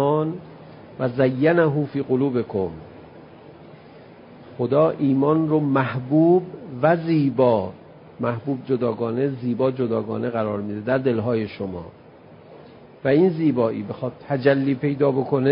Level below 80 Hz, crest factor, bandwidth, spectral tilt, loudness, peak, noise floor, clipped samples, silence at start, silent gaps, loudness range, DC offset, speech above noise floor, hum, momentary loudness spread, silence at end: -56 dBFS; 18 dB; 5.4 kHz; -12.5 dB/octave; -22 LUFS; -4 dBFS; -46 dBFS; under 0.1%; 0 s; none; 5 LU; under 0.1%; 25 dB; none; 12 LU; 0 s